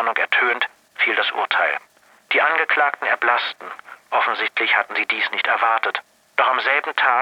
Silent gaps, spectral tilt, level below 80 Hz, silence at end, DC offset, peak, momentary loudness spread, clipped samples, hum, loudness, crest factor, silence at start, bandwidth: none; -1.5 dB/octave; -78 dBFS; 0 s; under 0.1%; -2 dBFS; 9 LU; under 0.1%; none; -19 LUFS; 20 dB; 0 s; 16 kHz